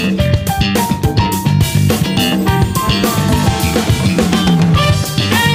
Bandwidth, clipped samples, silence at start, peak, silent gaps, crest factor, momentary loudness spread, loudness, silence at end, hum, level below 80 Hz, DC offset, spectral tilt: 16.5 kHz; under 0.1%; 0 s; -2 dBFS; none; 12 dB; 3 LU; -13 LUFS; 0 s; none; -28 dBFS; under 0.1%; -5 dB/octave